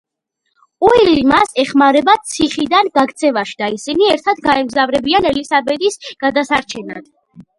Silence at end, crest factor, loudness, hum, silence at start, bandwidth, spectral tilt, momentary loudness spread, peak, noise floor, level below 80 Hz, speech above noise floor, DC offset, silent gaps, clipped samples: 0.2 s; 14 dB; -14 LUFS; none; 0.8 s; 11.5 kHz; -3.5 dB/octave; 9 LU; 0 dBFS; -71 dBFS; -46 dBFS; 57 dB; under 0.1%; none; under 0.1%